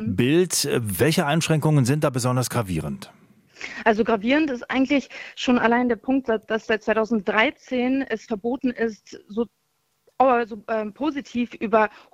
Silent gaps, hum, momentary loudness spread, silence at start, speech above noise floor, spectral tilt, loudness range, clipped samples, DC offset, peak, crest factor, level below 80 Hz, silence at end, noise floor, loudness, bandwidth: none; none; 9 LU; 0 s; 43 dB; -5 dB/octave; 3 LU; under 0.1%; under 0.1%; -2 dBFS; 20 dB; -56 dBFS; 0.25 s; -65 dBFS; -22 LUFS; 16.5 kHz